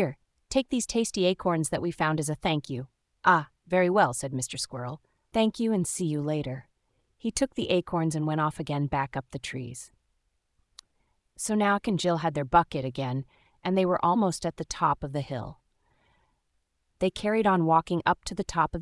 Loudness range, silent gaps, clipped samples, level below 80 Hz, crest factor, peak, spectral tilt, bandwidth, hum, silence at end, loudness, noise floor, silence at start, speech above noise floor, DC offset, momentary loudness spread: 5 LU; none; under 0.1%; -54 dBFS; 22 dB; -6 dBFS; -5 dB/octave; 12 kHz; none; 0 s; -28 LUFS; -75 dBFS; 0 s; 48 dB; under 0.1%; 12 LU